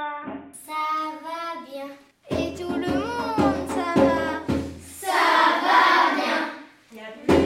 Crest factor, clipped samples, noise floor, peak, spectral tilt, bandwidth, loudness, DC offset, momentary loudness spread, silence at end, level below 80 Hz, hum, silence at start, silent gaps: 18 dB; under 0.1%; -43 dBFS; -6 dBFS; -4.5 dB/octave; 16 kHz; -23 LUFS; under 0.1%; 19 LU; 0 s; -48 dBFS; none; 0 s; none